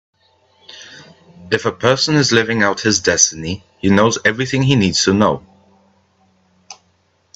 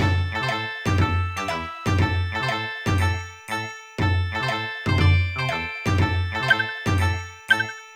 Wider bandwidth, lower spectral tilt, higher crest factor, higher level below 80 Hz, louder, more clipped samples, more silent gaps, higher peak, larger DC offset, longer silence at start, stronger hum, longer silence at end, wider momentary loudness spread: second, 8.4 kHz vs 14 kHz; second, -3.5 dB/octave vs -5.5 dB/octave; about the same, 18 dB vs 18 dB; second, -52 dBFS vs -40 dBFS; first, -15 LUFS vs -23 LUFS; neither; neither; first, 0 dBFS vs -4 dBFS; neither; first, 0.75 s vs 0 s; neither; first, 0.65 s vs 0 s; first, 13 LU vs 7 LU